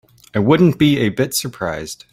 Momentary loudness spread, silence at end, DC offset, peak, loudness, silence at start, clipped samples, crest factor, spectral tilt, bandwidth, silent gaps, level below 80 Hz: 12 LU; 0.2 s; under 0.1%; -2 dBFS; -16 LUFS; 0.35 s; under 0.1%; 14 dB; -5.5 dB/octave; 16.5 kHz; none; -48 dBFS